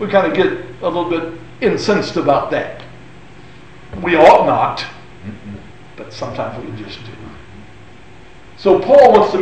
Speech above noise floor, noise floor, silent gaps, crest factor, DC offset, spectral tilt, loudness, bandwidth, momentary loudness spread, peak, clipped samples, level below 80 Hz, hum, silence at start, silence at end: 27 dB; -41 dBFS; none; 16 dB; 1%; -6 dB/octave; -14 LUFS; 8.8 kHz; 26 LU; 0 dBFS; under 0.1%; -46 dBFS; none; 0 s; 0 s